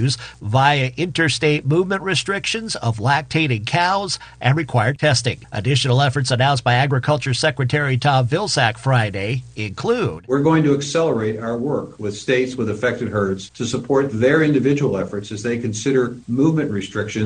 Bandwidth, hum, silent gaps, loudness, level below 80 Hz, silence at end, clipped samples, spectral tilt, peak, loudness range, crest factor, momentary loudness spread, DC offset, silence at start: 10 kHz; none; none; -19 LUFS; -50 dBFS; 0 s; under 0.1%; -5.5 dB/octave; 0 dBFS; 2 LU; 18 dB; 8 LU; under 0.1%; 0 s